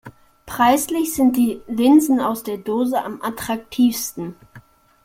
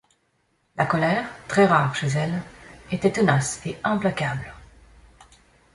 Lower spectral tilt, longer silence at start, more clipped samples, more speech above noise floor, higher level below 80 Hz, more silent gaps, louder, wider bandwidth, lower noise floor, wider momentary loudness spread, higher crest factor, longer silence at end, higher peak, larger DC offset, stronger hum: second, -4 dB/octave vs -5.5 dB/octave; second, 0.05 s vs 0.75 s; neither; second, 29 dB vs 46 dB; about the same, -54 dBFS vs -52 dBFS; neither; first, -19 LUFS vs -23 LUFS; first, 16.5 kHz vs 11.5 kHz; second, -47 dBFS vs -68 dBFS; about the same, 13 LU vs 14 LU; about the same, 16 dB vs 20 dB; second, 0.45 s vs 1.1 s; about the same, -4 dBFS vs -4 dBFS; neither; neither